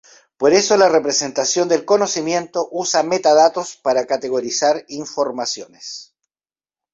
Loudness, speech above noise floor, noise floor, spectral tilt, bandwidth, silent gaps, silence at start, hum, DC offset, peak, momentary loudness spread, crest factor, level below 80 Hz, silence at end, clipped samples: -17 LUFS; over 73 dB; under -90 dBFS; -2.5 dB/octave; 7.8 kHz; none; 0.4 s; none; under 0.1%; -2 dBFS; 12 LU; 16 dB; -64 dBFS; 0.9 s; under 0.1%